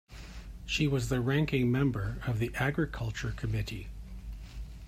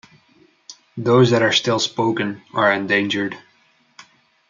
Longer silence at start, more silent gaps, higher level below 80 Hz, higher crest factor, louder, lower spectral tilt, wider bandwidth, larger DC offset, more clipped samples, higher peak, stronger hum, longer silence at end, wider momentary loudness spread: second, 0.1 s vs 0.7 s; neither; first, -44 dBFS vs -68 dBFS; about the same, 16 dB vs 18 dB; second, -31 LUFS vs -18 LUFS; first, -6 dB/octave vs -4.5 dB/octave; first, 15.5 kHz vs 7.6 kHz; neither; neither; second, -16 dBFS vs -2 dBFS; neither; second, 0 s vs 1.1 s; first, 18 LU vs 12 LU